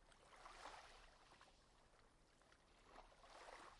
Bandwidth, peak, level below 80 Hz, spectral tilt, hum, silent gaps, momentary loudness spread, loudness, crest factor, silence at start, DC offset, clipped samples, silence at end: 11 kHz; -44 dBFS; -76 dBFS; -2.5 dB/octave; none; none; 9 LU; -64 LUFS; 22 dB; 0 s; under 0.1%; under 0.1%; 0 s